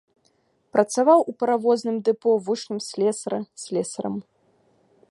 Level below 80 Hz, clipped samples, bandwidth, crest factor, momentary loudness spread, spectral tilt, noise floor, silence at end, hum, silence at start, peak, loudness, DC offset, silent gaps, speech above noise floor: -74 dBFS; under 0.1%; 11.5 kHz; 20 dB; 13 LU; -5 dB/octave; -66 dBFS; 0.9 s; none; 0.75 s; -4 dBFS; -23 LUFS; under 0.1%; none; 44 dB